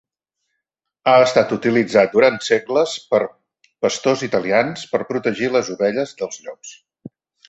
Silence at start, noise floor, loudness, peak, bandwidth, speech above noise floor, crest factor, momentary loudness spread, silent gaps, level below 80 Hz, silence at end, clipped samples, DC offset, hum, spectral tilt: 1.05 s; -79 dBFS; -18 LUFS; -2 dBFS; 8.2 kHz; 61 dB; 18 dB; 14 LU; none; -62 dBFS; 0.4 s; under 0.1%; under 0.1%; none; -4.5 dB/octave